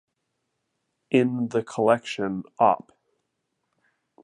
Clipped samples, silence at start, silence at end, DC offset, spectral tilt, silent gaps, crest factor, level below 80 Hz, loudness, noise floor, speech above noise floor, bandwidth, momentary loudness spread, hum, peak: under 0.1%; 1.1 s; 1.45 s; under 0.1%; -6.5 dB/octave; none; 22 dB; -70 dBFS; -24 LUFS; -78 dBFS; 55 dB; 10.5 kHz; 8 LU; none; -6 dBFS